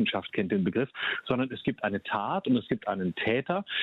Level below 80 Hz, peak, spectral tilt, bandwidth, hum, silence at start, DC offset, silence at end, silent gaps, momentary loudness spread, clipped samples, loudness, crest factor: -64 dBFS; -14 dBFS; -8.5 dB/octave; 4.6 kHz; none; 0 s; under 0.1%; 0 s; none; 4 LU; under 0.1%; -29 LUFS; 16 dB